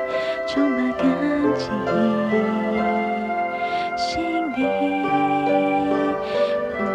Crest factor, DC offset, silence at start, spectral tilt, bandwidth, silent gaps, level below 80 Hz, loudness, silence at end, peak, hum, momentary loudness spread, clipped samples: 14 dB; under 0.1%; 0 s; -6 dB/octave; 10 kHz; none; -52 dBFS; -22 LUFS; 0 s; -8 dBFS; none; 4 LU; under 0.1%